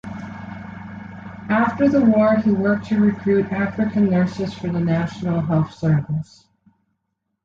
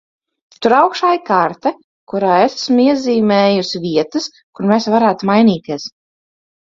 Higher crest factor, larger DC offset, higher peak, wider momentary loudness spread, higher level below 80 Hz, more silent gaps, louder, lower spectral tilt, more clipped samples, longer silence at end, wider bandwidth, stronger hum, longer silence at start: about the same, 14 dB vs 14 dB; neither; second, -6 dBFS vs 0 dBFS; first, 19 LU vs 10 LU; first, -50 dBFS vs -60 dBFS; second, none vs 1.84-2.07 s, 4.43-4.53 s; second, -19 LUFS vs -14 LUFS; first, -9 dB/octave vs -5.5 dB/octave; neither; first, 1.2 s vs 0.85 s; about the same, 7.4 kHz vs 7.6 kHz; neither; second, 0.05 s vs 0.6 s